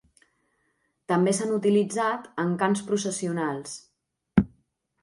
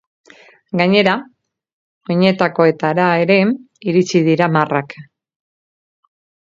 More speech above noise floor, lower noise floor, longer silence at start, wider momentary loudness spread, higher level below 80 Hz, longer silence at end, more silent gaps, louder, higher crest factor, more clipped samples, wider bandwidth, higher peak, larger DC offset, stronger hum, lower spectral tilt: second, 47 dB vs over 75 dB; second, -73 dBFS vs under -90 dBFS; first, 1.1 s vs 0.75 s; about the same, 10 LU vs 11 LU; first, -52 dBFS vs -64 dBFS; second, 0.55 s vs 1.45 s; second, none vs 1.73-2.01 s; second, -26 LUFS vs -15 LUFS; first, 22 dB vs 16 dB; neither; first, 11.5 kHz vs 7.6 kHz; second, -6 dBFS vs 0 dBFS; neither; neither; about the same, -5.5 dB/octave vs -6.5 dB/octave